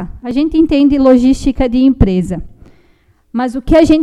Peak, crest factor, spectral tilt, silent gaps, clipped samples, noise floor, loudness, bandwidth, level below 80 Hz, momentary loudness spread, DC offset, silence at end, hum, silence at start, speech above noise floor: 0 dBFS; 12 dB; -7.5 dB/octave; none; 0.4%; -51 dBFS; -12 LUFS; 11 kHz; -26 dBFS; 11 LU; under 0.1%; 0 s; none; 0 s; 41 dB